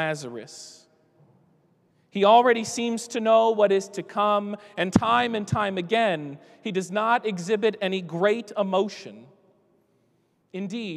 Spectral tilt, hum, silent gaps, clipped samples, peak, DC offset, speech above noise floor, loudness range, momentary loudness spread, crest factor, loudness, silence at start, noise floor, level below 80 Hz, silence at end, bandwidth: -5 dB/octave; none; none; under 0.1%; -4 dBFS; under 0.1%; 44 dB; 5 LU; 18 LU; 22 dB; -24 LUFS; 0 s; -67 dBFS; -62 dBFS; 0 s; 13 kHz